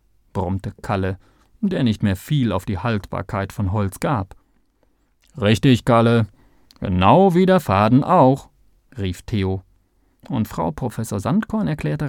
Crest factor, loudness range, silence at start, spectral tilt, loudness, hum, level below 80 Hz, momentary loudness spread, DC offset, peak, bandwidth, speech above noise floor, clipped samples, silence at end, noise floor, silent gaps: 18 dB; 8 LU; 0.35 s; -7.5 dB/octave; -20 LUFS; none; -44 dBFS; 13 LU; under 0.1%; -2 dBFS; 17.5 kHz; 44 dB; under 0.1%; 0 s; -62 dBFS; none